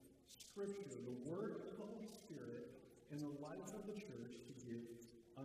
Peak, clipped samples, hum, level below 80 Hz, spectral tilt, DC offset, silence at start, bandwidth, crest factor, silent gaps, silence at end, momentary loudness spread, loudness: -36 dBFS; under 0.1%; none; -82 dBFS; -6 dB/octave; under 0.1%; 0 s; 15.5 kHz; 16 dB; none; 0 s; 11 LU; -52 LUFS